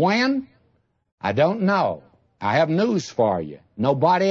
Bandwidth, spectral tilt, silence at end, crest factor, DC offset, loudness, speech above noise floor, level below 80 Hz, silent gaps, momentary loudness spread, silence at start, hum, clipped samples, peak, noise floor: 7.8 kHz; -6.5 dB/octave; 0 s; 16 dB; under 0.1%; -21 LUFS; 45 dB; -64 dBFS; 1.12-1.18 s; 10 LU; 0 s; none; under 0.1%; -6 dBFS; -65 dBFS